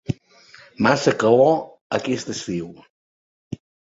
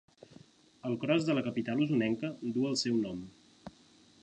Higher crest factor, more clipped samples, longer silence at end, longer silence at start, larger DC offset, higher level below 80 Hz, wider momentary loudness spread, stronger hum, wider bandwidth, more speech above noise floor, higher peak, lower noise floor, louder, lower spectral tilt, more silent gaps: about the same, 20 dB vs 18 dB; neither; second, 0.4 s vs 0.55 s; second, 0.1 s vs 0.3 s; neither; first, -56 dBFS vs -70 dBFS; about the same, 22 LU vs 23 LU; neither; second, 8 kHz vs 9.8 kHz; about the same, 30 dB vs 30 dB; first, -2 dBFS vs -16 dBFS; second, -49 dBFS vs -62 dBFS; first, -20 LUFS vs -32 LUFS; about the same, -5.5 dB/octave vs -5.5 dB/octave; first, 1.81-1.90 s, 2.90-3.51 s vs none